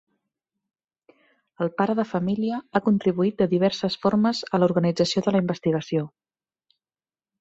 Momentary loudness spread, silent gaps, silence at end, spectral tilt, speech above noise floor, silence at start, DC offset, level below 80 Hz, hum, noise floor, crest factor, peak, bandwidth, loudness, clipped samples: 6 LU; none; 1.3 s; -6.5 dB/octave; over 67 dB; 1.6 s; under 0.1%; -62 dBFS; none; under -90 dBFS; 20 dB; -6 dBFS; 8 kHz; -23 LUFS; under 0.1%